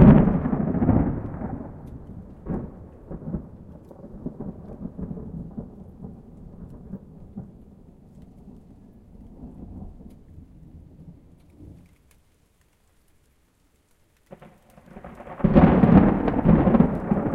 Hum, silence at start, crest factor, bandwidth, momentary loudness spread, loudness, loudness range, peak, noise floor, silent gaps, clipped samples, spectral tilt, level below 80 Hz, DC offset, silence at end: none; 0 s; 24 dB; 4.2 kHz; 27 LU; -21 LUFS; 25 LU; 0 dBFS; -63 dBFS; none; under 0.1%; -11 dB/octave; -36 dBFS; under 0.1%; 0 s